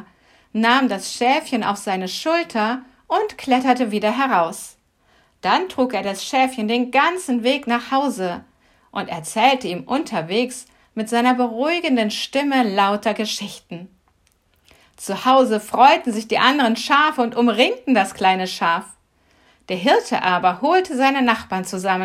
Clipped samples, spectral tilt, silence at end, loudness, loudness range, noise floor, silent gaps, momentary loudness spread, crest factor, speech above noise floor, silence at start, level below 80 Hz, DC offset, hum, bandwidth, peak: under 0.1%; -4 dB/octave; 0 s; -19 LUFS; 5 LU; -61 dBFS; none; 11 LU; 20 dB; 43 dB; 0.55 s; -64 dBFS; under 0.1%; none; 15.5 kHz; 0 dBFS